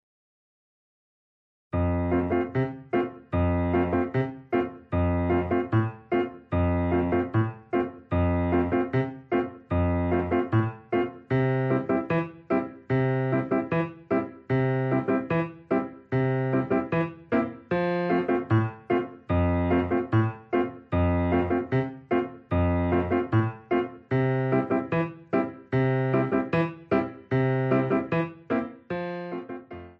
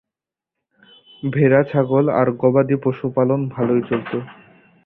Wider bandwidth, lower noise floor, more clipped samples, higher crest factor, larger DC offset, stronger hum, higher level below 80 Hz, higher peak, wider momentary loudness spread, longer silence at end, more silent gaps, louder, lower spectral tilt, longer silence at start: first, 5.6 kHz vs 4.3 kHz; about the same, under -90 dBFS vs -87 dBFS; neither; about the same, 16 dB vs 18 dB; neither; neither; first, -46 dBFS vs -56 dBFS; second, -10 dBFS vs -2 dBFS; second, 5 LU vs 12 LU; second, 0.1 s vs 0.55 s; neither; second, -27 LUFS vs -18 LUFS; second, -10.5 dB/octave vs -12 dB/octave; first, 1.75 s vs 1.25 s